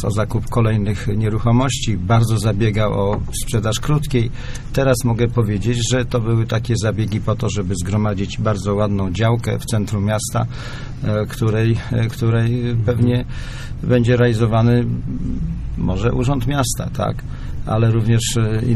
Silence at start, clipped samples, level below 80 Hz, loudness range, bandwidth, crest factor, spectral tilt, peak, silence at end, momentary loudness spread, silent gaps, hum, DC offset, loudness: 0 s; under 0.1%; -30 dBFS; 2 LU; 13.5 kHz; 14 dB; -6 dB/octave; -2 dBFS; 0 s; 8 LU; none; none; under 0.1%; -19 LUFS